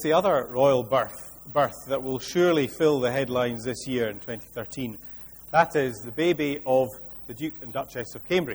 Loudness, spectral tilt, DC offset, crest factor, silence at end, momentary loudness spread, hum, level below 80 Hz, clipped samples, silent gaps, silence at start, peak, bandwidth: -26 LUFS; -5.5 dB/octave; under 0.1%; 20 dB; 0 s; 13 LU; none; -56 dBFS; under 0.1%; none; 0 s; -6 dBFS; over 20 kHz